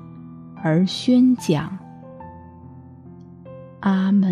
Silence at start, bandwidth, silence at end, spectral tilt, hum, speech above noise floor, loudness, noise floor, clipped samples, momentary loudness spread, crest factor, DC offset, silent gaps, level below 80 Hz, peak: 0 s; 13.5 kHz; 0 s; -7 dB/octave; none; 24 dB; -20 LUFS; -42 dBFS; under 0.1%; 26 LU; 16 dB; under 0.1%; none; -62 dBFS; -6 dBFS